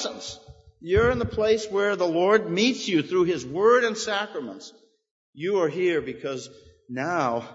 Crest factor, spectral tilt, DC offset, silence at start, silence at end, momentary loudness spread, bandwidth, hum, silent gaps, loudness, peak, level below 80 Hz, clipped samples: 18 dB; -4.5 dB/octave; under 0.1%; 0 s; 0 s; 16 LU; 8 kHz; none; 5.11-5.33 s; -24 LUFS; -6 dBFS; -48 dBFS; under 0.1%